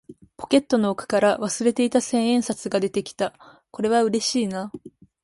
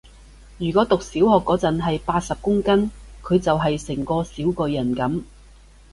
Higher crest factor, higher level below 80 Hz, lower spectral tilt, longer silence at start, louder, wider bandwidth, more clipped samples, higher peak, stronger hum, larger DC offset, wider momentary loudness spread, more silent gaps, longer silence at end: about the same, 18 dB vs 18 dB; second, -62 dBFS vs -42 dBFS; second, -4 dB/octave vs -6.5 dB/octave; second, 0.1 s vs 0.5 s; about the same, -22 LUFS vs -21 LUFS; about the same, 11.5 kHz vs 11.5 kHz; neither; about the same, -6 dBFS vs -4 dBFS; neither; neither; about the same, 10 LU vs 8 LU; neither; second, 0.35 s vs 0.65 s